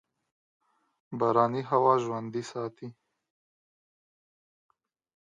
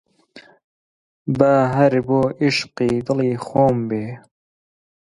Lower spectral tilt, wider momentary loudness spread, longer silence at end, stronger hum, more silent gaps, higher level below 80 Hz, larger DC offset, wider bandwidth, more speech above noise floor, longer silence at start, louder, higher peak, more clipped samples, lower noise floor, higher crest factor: about the same, -7 dB/octave vs -7 dB/octave; first, 18 LU vs 11 LU; first, 2.3 s vs 0.95 s; neither; second, none vs 0.64-1.25 s; second, -80 dBFS vs -54 dBFS; neither; second, 9.6 kHz vs 11.5 kHz; first, over 62 dB vs 29 dB; first, 1.1 s vs 0.35 s; second, -28 LUFS vs -18 LUFS; second, -8 dBFS vs 0 dBFS; neither; first, under -90 dBFS vs -47 dBFS; about the same, 24 dB vs 20 dB